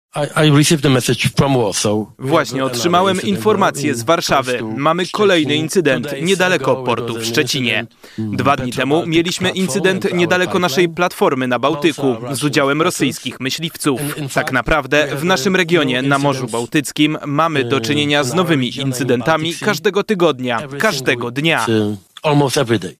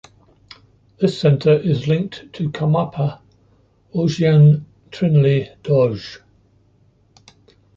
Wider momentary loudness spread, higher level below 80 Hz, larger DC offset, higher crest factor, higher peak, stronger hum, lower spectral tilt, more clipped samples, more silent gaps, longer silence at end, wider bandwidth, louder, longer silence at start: second, 6 LU vs 14 LU; first, -46 dBFS vs -52 dBFS; neither; about the same, 14 dB vs 16 dB; about the same, -2 dBFS vs -4 dBFS; neither; second, -4.5 dB/octave vs -8.5 dB/octave; neither; neither; second, 0.05 s vs 1.6 s; first, 16 kHz vs 7.4 kHz; about the same, -16 LUFS vs -18 LUFS; second, 0.15 s vs 1 s